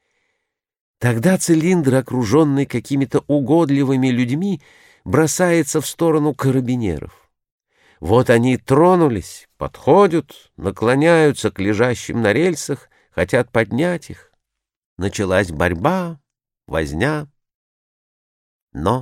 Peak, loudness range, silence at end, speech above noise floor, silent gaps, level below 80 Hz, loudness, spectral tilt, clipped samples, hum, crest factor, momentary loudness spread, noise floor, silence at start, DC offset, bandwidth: -2 dBFS; 5 LU; 0 s; 61 dB; 7.51-7.58 s, 14.77-14.97 s, 17.54-18.68 s; -44 dBFS; -17 LUFS; -6 dB/octave; under 0.1%; none; 16 dB; 13 LU; -78 dBFS; 1 s; under 0.1%; 16.5 kHz